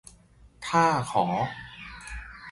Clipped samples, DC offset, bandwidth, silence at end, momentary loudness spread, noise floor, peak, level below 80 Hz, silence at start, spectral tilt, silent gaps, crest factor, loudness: under 0.1%; under 0.1%; 11.5 kHz; 0 s; 18 LU; -55 dBFS; -8 dBFS; -50 dBFS; 0.45 s; -5 dB/octave; none; 22 dB; -26 LUFS